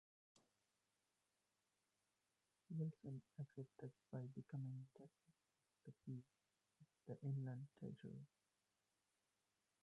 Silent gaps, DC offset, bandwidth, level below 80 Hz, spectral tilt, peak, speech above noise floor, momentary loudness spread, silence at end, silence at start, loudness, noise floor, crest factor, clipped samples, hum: none; under 0.1%; 10.5 kHz; under -90 dBFS; -9.5 dB/octave; -38 dBFS; over 37 dB; 17 LU; 1.55 s; 0.35 s; -54 LUFS; under -90 dBFS; 18 dB; under 0.1%; none